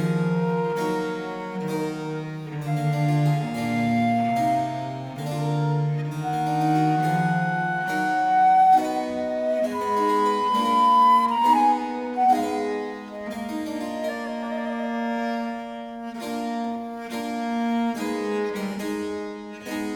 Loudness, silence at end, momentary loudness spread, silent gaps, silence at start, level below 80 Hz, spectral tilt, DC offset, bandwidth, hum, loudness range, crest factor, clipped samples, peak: -24 LUFS; 0 s; 13 LU; none; 0 s; -62 dBFS; -6.5 dB/octave; under 0.1%; 18 kHz; none; 9 LU; 14 dB; under 0.1%; -8 dBFS